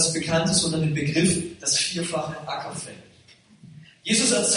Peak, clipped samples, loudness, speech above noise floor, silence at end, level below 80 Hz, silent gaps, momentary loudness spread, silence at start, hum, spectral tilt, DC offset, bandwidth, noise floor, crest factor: -6 dBFS; under 0.1%; -23 LUFS; 30 dB; 0 s; -54 dBFS; none; 13 LU; 0 s; none; -3 dB/octave; under 0.1%; 11 kHz; -54 dBFS; 18 dB